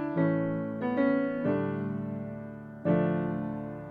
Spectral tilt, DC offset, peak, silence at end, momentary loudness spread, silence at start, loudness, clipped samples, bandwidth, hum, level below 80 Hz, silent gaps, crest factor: -11 dB/octave; under 0.1%; -14 dBFS; 0 s; 11 LU; 0 s; -30 LUFS; under 0.1%; 4.6 kHz; none; -62 dBFS; none; 16 dB